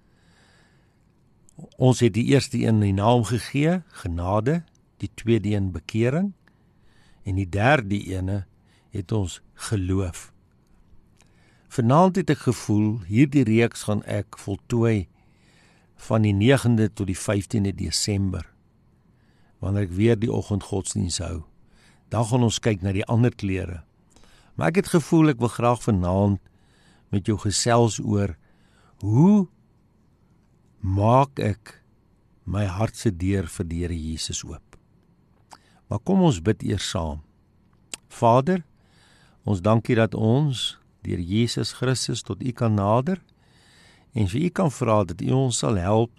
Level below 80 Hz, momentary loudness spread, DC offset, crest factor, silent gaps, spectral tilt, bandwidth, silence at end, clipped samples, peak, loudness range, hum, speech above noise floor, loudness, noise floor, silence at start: -48 dBFS; 13 LU; under 0.1%; 18 dB; none; -6 dB/octave; 13 kHz; 0.1 s; under 0.1%; -6 dBFS; 5 LU; none; 38 dB; -23 LUFS; -60 dBFS; 1.6 s